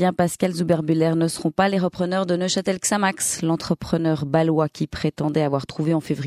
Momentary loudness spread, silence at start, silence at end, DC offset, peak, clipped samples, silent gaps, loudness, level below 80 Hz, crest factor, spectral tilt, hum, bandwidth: 4 LU; 0 s; 0 s; under 0.1%; -4 dBFS; under 0.1%; none; -22 LUFS; -52 dBFS; 16 dB; -5 dB/octave; none; 15 kHz